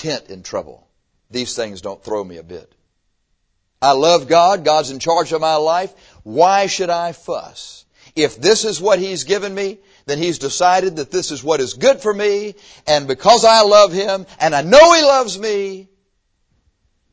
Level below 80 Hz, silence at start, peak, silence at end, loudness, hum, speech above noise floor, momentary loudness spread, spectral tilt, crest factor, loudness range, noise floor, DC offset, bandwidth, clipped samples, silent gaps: -52 dBFS; 0 s; 0 dBFS; 1.3 s; -15 LUFS; none; 51 dB; 18 LU; -3 dB/octave; 16 dB; 7 LU; -66 dBFS; under 0.1%; 8 kHz; under 0.1%; none